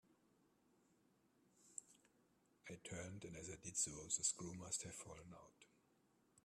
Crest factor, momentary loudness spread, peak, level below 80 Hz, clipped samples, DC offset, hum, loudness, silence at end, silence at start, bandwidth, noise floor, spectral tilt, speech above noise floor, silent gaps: 26 dB; 18 LU; -26 dBFS; -78 dBFS; under 0.1%; under 0.1%; none; -47 LUFS; 0.05 s; 0.1 s; 14 kHz; -79 dBFS; -2.5 dB/octave; 30 dB; none